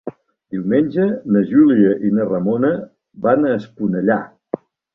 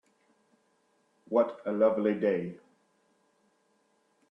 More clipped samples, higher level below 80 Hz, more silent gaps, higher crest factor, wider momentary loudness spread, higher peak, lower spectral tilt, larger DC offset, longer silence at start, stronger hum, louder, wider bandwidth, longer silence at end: neither; first, -58 dBFS vs -78 dBFS; neither; about the same, 16 dB vs 20 dB; first, 16 LU vs 7 LU; first, -2 dBFS vs -12 dBFS; first, -11 dB/octave vs -9 dB/octave; neither; second, 0.05 s vs 1.3 s; neither; first, -17 LUFS vs -29 LUFS; second, 4.2 kHz vs 5.8 kHz; second, 0.4 s vs 1.75 s